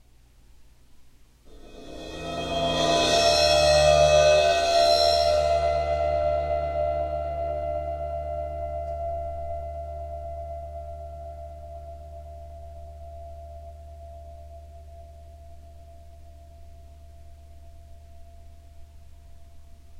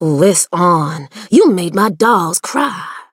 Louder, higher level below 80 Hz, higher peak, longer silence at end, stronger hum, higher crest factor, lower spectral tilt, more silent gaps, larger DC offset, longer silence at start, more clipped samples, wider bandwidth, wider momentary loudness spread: second, -23 LUFS vs -13 LUFS; first, -42 dBFS vs -62 dBFS; second, -8 dBFS vs 0 dBFS; about the same, 0 s vs 0.1 s; neither; about the same, 18 dB vs 14 dB; about the same, -3.5 dB/octave vs -4.5 dB/octave; neither; neither; first, 0.6 s vs 0 s; neither; second, 14.5 kHz vs 16.5 kHz; first, 25 LU vs 9 LU